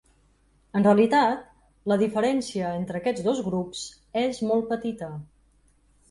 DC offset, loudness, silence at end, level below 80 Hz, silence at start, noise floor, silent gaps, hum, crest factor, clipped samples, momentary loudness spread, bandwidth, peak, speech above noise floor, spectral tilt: under 0.1%; -25 LUFS; 0.85 s; -60 dBFS; 0.75 s; -62 dBFS; none; none; 18 dB; under 0.1%; 15 LU; 11.5 kHz; -8 dBFS; 38 dB; -6 dB/octave